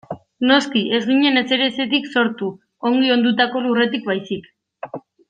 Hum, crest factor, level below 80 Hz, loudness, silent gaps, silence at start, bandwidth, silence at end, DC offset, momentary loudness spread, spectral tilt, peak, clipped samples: none; 16 dB; -66 dBFS; -18 LUFS; none; 0.1 s; 9 kHz; 0.3 s; under 0.1%; 15 LU; -5 dB/octave; -2 dBFS; under 0.1%